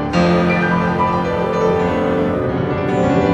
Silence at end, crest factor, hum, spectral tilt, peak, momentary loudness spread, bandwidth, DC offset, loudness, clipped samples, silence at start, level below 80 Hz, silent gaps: 0 s; 12 dB; none; -7.5 dB/octave; -4 dBFS; 4 LU; 8.2 kHz; under 0.1%; -16 LUFS; under 0.1%; 0 s; -40 dBFS; none